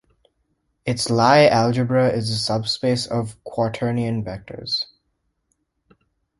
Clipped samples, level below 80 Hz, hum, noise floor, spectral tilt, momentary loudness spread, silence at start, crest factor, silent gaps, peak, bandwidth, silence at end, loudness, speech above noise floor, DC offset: under 0.1%; -54 dBFS; none; -72 dBFS; -5.5 dB/octave; 15 LU; 0.85 s; 20 dB; none; -2 dBFS; 11.5 kHz; 1.55 s; -20 LUFS; 52 dB; under 0.1%